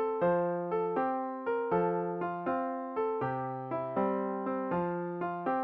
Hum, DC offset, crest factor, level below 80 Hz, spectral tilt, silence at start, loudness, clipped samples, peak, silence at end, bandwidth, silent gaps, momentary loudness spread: none; under 0.1%; 14 dB; -68 dBFS; -7.5 dB/octave; 0 s; -33 LUFS; under 0.1%; -18 dBFS; 0 s; 4.7 kHz; none; 5 LU